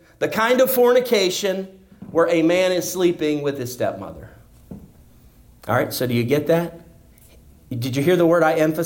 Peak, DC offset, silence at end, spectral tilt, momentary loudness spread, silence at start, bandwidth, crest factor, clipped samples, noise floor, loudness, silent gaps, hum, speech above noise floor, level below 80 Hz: -6 dBFS; under 0.1%; 0 s; -5 dB/octave; 13 LU; 0.2 s; 17 kHz; 14 dB; under 0.1%; -49 dBFS; -19 LUFS; none; none; 30 dB; -54 dBFS